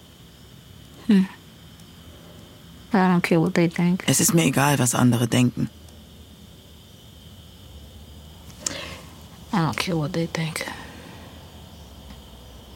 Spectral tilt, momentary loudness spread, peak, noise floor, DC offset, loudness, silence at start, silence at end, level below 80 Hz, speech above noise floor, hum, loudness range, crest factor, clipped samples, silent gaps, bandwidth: -5 dB/octave; 26 LU; -2 dBFS; -47 dBFS; under 0.1%; -22 LUFS; 0.95 s; 0 s; -52 dBFS; 27 dB; none; 17 LU; 22 dB; under 0.1%; none; 17 kHz